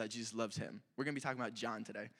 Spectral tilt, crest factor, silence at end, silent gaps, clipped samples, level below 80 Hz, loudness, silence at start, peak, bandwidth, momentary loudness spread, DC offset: -4 dB/octave; 20 dB; 0.1 s; none; under 0.1%; -84 dBFS; -42 LUFS; 0 s; -22 dBFS; 15 kHz; 5 LU; under 0.1%